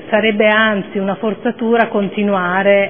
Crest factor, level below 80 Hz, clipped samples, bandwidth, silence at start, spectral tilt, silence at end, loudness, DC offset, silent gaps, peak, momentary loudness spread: 14 dB; -60 dBFS; under 0.1%; 3.6 kHz; 0 s; -9.5 dB/octave; 0 s; -15 LUFS; 0.6%; none; 0 dBFS; 8 LU